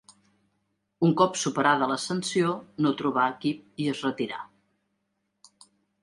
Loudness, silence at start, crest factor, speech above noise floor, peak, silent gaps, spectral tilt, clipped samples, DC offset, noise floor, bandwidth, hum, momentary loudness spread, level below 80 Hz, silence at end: -26 LUFS; 1 s; 22 dB; 52 dB; -6 dBFS; none; -5 dB/octave; under 0.1%; under 0.1%; -77 dBFS; 11.5 kHz; none; 9 LU; -72 dBFS; 1.55 s